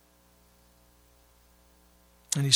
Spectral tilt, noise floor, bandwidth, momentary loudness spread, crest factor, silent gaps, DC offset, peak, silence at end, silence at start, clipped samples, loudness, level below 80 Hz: -3 dB/octave; -62 dBFS; 16.5 kHz; 29 LU; 30 dB; none; under 0.1%; -4 dBFS; 0 s; 2.3 s; under 0.1%; -31 LUFS; -66 dBFS